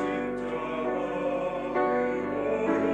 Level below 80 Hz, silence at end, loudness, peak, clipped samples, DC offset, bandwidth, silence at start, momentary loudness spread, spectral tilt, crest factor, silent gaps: -56 dBFS; 0 s; -29 LUFS; -14 dBFS; under 0.1%; under 0.1%; 9.2 kHz; 0 s; 5 LU; -7 dB/octave; 14 dB; none